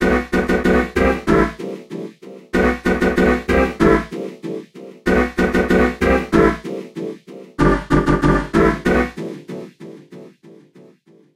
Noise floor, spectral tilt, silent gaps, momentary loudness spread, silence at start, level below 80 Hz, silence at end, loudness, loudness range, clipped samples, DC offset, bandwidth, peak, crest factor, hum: -50 dBFS; -7 dB/octave; none; 16 LU; 0 s; -30 dBFS; 0.85 s; -17 LUFS; 1 LU; under 0.1%; under 0.1%; 15.5 kHz; 0 dBFS; 18 dB; none